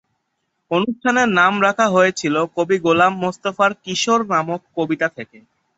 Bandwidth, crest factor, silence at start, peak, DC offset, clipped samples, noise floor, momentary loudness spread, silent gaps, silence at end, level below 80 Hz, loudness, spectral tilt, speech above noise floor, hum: 8.2 kHz; 18 dB; 0.7 s; -2 dBFS; under 0.1%; under 0.1%; -73 dBFS; 9 LU; none; 0.55 s; -62 dBFS; -18 LUFS; -4.5 dB/octave; 55 dB; none